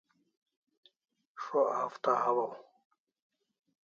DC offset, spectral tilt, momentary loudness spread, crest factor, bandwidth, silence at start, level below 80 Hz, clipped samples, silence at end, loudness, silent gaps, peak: under 0.1%; -3.5 dB/octave; 14 LU; 22 dB; 7.4 kHz; 1.35 s; -86 dBFS; under 0.1%; 1.25 s; -32 LUFS; none; -14 dBFS